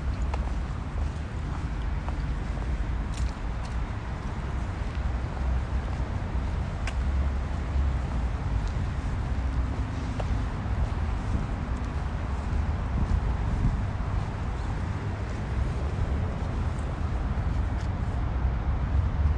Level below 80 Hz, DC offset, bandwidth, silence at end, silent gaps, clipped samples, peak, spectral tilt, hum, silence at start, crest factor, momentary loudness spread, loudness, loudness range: -30 dBFS; under 0.1%; 9.6 kHz; 0 s; none; under 0.1%; -14 dBFS; -7.5 dB/octave; none; 0 s; 14 dB; 4 LU; -31 LUFS; 2 LU